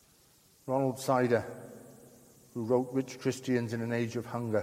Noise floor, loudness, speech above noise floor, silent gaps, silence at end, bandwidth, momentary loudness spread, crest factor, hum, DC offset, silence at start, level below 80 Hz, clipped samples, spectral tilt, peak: -63 dBFS; -32 LUFS; 32 dB; none; 0 s; 16 kHz; 17 LU; 18 dB; none; under 0.1%; 0.65 s; -72 dBFS; under 0.1%; -6.5 dB/octave; -14 dBFS